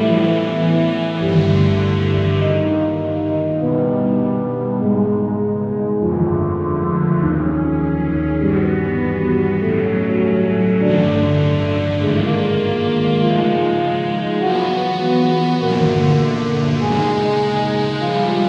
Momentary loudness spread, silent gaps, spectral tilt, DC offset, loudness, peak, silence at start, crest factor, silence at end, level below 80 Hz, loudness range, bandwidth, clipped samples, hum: 4 LU; none; -8.5 dB/octave; under 0.1%; -17 LUFS; -2 dBFS; 0 s; 14 dB; 0 s; -40 dBFS; 2 LU; 7.6 kHz; under 0.1%; none